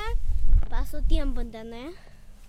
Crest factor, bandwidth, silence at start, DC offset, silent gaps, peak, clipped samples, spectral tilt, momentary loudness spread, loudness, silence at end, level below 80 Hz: 14 dB; 4.9 kHz; 0 s; under 0.1%; none; -8 dBFS; under 0.1%; -6.5 dB/octave; 13 LU; -31 LUFS; 0.05 s; -24 dBFS